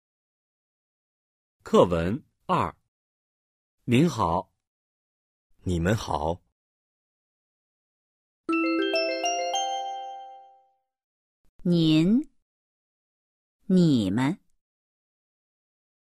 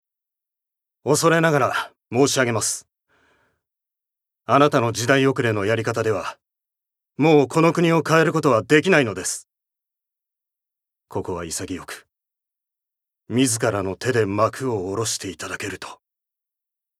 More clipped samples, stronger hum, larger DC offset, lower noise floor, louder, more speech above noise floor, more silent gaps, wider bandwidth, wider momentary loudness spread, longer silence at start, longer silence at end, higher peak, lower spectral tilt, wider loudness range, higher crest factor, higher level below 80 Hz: neither; first, 60 Hz at -55 dBFS vs none; neither; second, -65 dBFS vs -84 dBFS; second, -25 LUFS vs -20 LUFS; second, 42 dB vs 64 dB; first, 2.88-3.78 s, 4.67-5.50 s, 6.52-8.44 s, 11.04-11.59 s, 12.42-13.59 s vs none; second, 13.5 kHz vs 15.5 kHz; about the same, 17 LU vs 15 LU; first, 1.65 s vs 1.05 s; first, 1.7 s vs 1.05 s; second, -6 dBFS vs 0 dBFS; first, -6 dB/octave vs -4.5 dB/octave; second, 6 LU vs 11 LU; about the same, 22 dB vs 22 dB; first, -52 dBFS vs -64 dBFS